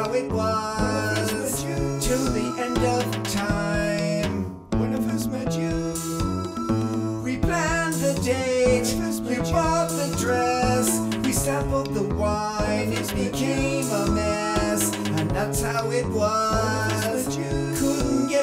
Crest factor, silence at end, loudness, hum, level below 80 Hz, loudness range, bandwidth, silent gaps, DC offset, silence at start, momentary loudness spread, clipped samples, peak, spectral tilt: 16 dB; 0 s; -24 LUFS; none; -38 dBFS; 3 LU; 16 kHz; none; under 0.1%; 0 s; 5 LU; under 0.1%; -8 dBFS; -5 dB/octave